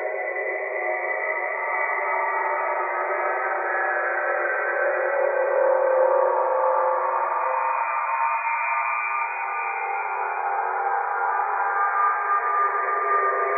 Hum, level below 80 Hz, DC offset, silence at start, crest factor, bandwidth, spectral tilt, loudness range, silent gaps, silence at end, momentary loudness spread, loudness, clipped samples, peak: none; under -90 dBFS; under 0.1%; 0 s; 14 dB; 2.7 kHz; -1 dB/octave; 3 LU; none; 0 s; 5 LU; -23 LUFS; under 0.1%; -10 dBFS